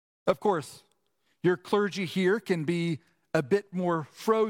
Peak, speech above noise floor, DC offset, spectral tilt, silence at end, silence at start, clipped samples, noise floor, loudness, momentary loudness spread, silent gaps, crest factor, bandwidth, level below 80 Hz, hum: -10 dBFS; 48 dB; under 0.1%; -6.5 dB/octave; 0 s; 0.25 s; under 0.1%; -75 dBFS; -29 LUFS; 5 LU; none; 18 dB; 16.5 kHz; -70 dBFS; none